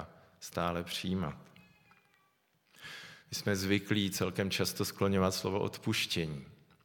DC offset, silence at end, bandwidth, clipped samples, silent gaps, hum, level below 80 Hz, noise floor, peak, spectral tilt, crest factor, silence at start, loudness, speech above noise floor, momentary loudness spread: under 0.1%; 0.3 s; 19 kHz; under 0.1%; none; none; -64 dBFS; -73 dBFS; -14 dBFS; -4.5 dB/octave; 22 dB; 0 s; -34 LUFS; 39 dB; 17 LU